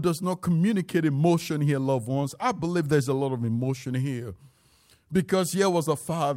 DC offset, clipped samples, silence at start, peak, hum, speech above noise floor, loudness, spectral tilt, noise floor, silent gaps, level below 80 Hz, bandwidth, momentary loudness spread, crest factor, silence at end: under 0.1%; under 0.1%; 0 s; -10 dBFS; none; 36 dB; -26 LUFS; -6.5 dB/octave; -61 dBFS; none; -60 dBFS; 16.5 kHz; 6 LU; 16 dB; 0 s